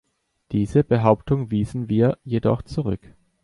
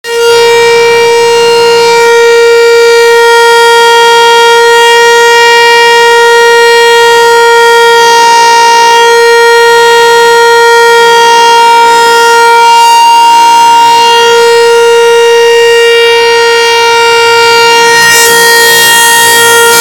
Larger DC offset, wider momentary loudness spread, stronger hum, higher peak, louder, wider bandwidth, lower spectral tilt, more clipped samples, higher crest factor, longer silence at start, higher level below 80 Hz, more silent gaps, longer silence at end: second, under 0.1% vs 0.8%; first, 9 LU vs 2 LU; neither; about the same, -2 dBFS vs 0 dBFS; second, -22 LUFS vs -2 LUFS; second, 11 kHz vs 19 kHz; first, -9 dB/octave vs 0 dB/octave; second, under 0.1% vs 10%; first, 20 dB vs 2 dB; first, 0.5 s vs 0.05 s; first, -44 dBFS vs -50 dBFS; neither; first, 0.45 s vs 0 s